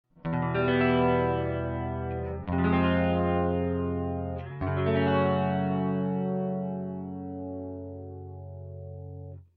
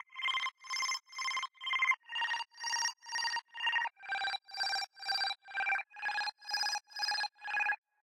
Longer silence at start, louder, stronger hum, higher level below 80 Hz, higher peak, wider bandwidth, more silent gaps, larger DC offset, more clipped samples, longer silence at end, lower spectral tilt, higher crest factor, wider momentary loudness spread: first, 0.25 s vs 0.1 s; first, -28 LUFS vs -35 LUFS; neither; first, -48 dBFS vs -84 dBFS; first, -12 dBFS vs -18 dBFS; second, 4.9 kHz vs 16 kHz; neither; neither; neither; about the same, 0.15 s vs 0.25 s; first, -6.5 dB/octave vs 3.5 dB/octave; about the same, 16 dB vs 18 dB; first, 17 LU vs 4 LU